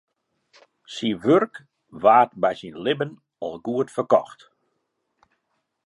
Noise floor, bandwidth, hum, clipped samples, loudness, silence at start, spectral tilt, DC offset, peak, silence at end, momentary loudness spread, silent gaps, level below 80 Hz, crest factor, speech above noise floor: -75 dBFS; 11.5 kHz; none; under 0.1%; -22 LUFS; 0.9 s; -6 dB/octave; under 0.1%; -2 dBFS; 1.55 s; 16 LU; none; -68 dBFS; 22 dB; 54 dB